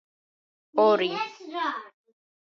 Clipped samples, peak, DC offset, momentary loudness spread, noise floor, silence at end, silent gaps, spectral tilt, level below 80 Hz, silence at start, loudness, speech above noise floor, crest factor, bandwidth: under 0.1%; -8 dBFS; under 0.1%; 12 LU; under -90 dBFS; 0.65 s; none; -5 dB/octave; -84 dBFS; 0.75 s; -26 LUFS; over 65 dB; 20 dB; 6.8 kHz